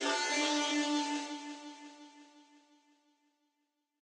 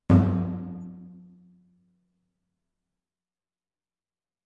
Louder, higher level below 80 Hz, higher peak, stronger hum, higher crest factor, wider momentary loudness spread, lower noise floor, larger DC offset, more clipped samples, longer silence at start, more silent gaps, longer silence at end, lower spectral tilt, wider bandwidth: second, -33 LUFS vs -25 LUFS; second, under -90 dBFS vs -54 dBFS; second, -22 dBFS vs -6 dBFS; neither; second, 16 dB vs 24 dB; second, 21 LU vs 25 LU; second, -83 dBFS vs under -90 dBFS; neither; neither; about the same, 0 s vs 0.1 s; neither; second, 1.6 s vs 3.3 s; second, 1 dB/octave vs -10.5 dB/octave; first, 10.5 kHz vs 4.9 kHz